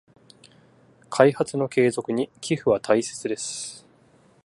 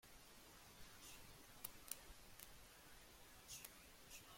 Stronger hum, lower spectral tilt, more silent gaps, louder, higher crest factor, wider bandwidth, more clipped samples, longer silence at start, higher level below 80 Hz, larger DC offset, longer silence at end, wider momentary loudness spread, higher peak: neither; first, -5 dB/octave vs -1.5 dB/octave; neither; first, -23 LUFS vs -59 LUFS; second, 24 dB vs 38 dB; second, 11.5 kHz vs 16.5 kHz; neither; first, 1.1 s vs 0 s; first, -64 dBFS vs -72 dBFS; neither; first, 0.65 s vs 0 s; about the same, 11 LU vs 9 LU; first, -2 dBFS vs -24 dBFS